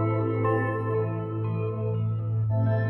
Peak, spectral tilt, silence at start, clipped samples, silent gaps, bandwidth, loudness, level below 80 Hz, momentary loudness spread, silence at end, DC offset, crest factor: -12 dBFS; -11 dB/octave; 0 s; under 0.1%; none; 3.3 kHz; -27 LUFS; -54 dBFS; 4 LU; 0 s; under 0.1%; 14 dB